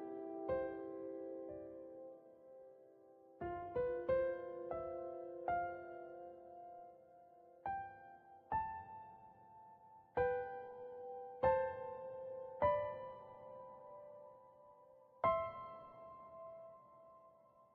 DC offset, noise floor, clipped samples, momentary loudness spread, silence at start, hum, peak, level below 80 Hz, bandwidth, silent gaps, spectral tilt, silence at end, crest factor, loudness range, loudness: under 0.1%; -67 dBFS; under 0.1%; 25 LU; 0 s; none; -22 dBFS; -70 dBFS; 4.6 kHz; none; -5.5 dB/octave; 0.1 s; 22 dB; 7 LU; -43 LUFS